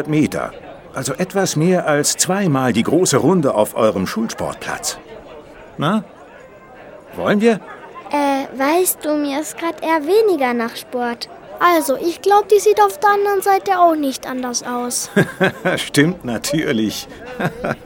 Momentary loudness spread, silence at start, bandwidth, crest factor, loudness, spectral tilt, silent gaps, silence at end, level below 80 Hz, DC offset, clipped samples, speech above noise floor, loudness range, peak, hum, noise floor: 11 LU; 0 s; 18.5 kHz; 18 dB; -17 LUFS; -4.5 dB/octave; none; 0 s; -52 dBFS; under 0.1%; under 0.1%; 24 dB; 7 LU; 0 dBFS; none; -40 dBFS